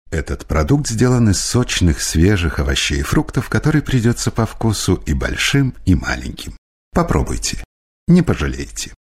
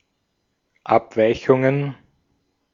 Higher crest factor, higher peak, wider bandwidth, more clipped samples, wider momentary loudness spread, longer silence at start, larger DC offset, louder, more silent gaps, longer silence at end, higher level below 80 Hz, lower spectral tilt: about the same, 16 dB vs 20 dB; about the same, -2 dBFS vs -2 dBFS; first, 16 kHz vs 7.4 kHz; neither; about the same, 10 LU vs 11 LU; second, 0.1 s vs 0.85 s; neither; about the same, -17 LUFS vs -19 LUFS; first, 6.58-6.91 s, 7.65-8.07 s vs none; second, 0.25 s vs 0.8 s; first, -26 dBFS vs -56 dBFS; second, -5 dB/octave vs -8 dB/octave